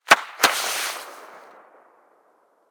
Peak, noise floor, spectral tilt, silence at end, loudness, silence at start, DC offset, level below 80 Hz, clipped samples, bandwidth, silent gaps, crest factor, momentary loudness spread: -2 dBFS; -62 dBFS; 0.5 dB/octave; 1.3 s; -20 LUFS; 0.1 s; under 0.1%; -72 dBFS; under 0.1%; over 20 kHz; none; 24 dB; 25 LU